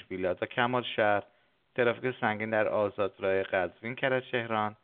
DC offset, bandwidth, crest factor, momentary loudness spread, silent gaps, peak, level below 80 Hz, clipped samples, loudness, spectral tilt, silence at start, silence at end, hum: under 0.1%; 4.4 kHz; 20 dB; 5 LU; none; -10 dBFS; -72 dBFS; under 0.1%; -30 LUFS; -3 dB/octave; 0.1 s; 0.1 s; none